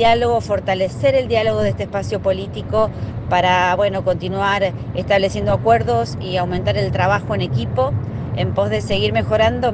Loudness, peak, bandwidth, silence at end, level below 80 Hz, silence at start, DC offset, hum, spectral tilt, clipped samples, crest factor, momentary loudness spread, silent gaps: -18 LUFS; -2 dBFS; 9.2 kHz; 0 s; -38 dBFS; 0 s; under 0.1%; none; -6.5 dB/octave; under 0.1%; 16 dB; 6 LU; none